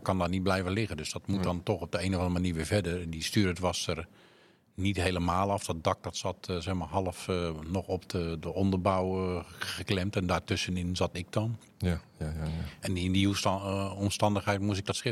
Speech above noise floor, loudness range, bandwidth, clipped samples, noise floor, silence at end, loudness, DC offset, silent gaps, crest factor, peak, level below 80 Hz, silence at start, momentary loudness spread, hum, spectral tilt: 31 dB; 2 LU; 14 kHz; under 0.1%; -61 dBFS; 0 s; -31 LUFS; under 0.1%; none; 20 dB; -10 dBFS; -50 dBFS; 0 s; 7 LU; none; -5.5 dB/octave